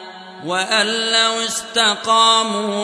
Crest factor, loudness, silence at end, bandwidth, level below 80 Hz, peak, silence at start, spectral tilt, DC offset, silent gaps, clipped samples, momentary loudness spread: 16 dB; -15 LUFS; 0 s; 11 kHz; -68 dBFS; -2 dBFS; 0 s; -1 dB/octave; under 0.1%; none; under 0.1%; 10 LU